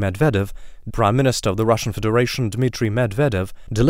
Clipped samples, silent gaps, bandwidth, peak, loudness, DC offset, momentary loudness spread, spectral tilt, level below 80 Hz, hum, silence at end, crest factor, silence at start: under 0.1%; none; 16 kHz; -4 dBFS; -20 LUFS; under 0.1%; 8 LU; -6 dB/octave; -36 dBFS; none; 0 s; 16 dB; 0 s